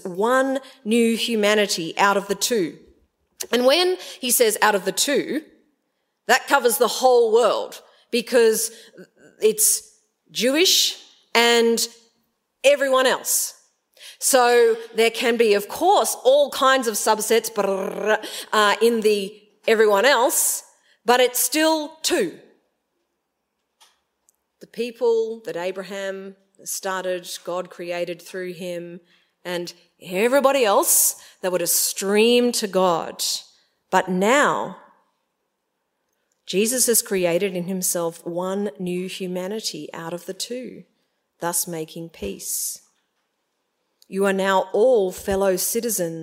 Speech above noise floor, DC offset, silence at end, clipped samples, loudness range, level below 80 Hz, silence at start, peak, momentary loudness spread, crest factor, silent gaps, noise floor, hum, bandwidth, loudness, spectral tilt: 56 dB; under 0.1%; 0 s; under 0.1%; 10 LU; -62 dBFS; 0.05 s; 0 dBFS; 14 LU; 22 dB; none; -76 dBFS; none; 16.5 kHz; -20 LUFS; -2 dB/octave